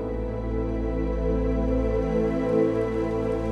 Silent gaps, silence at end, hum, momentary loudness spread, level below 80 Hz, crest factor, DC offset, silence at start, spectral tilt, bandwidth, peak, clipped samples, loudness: none; 0 s; none; 6 LU; -32 dBFS; 14 dB; under 0.1%; 0 s; -9 dB/octave; 6.4 kHz; -10 dBFS; under 0.1%; -26 LUFS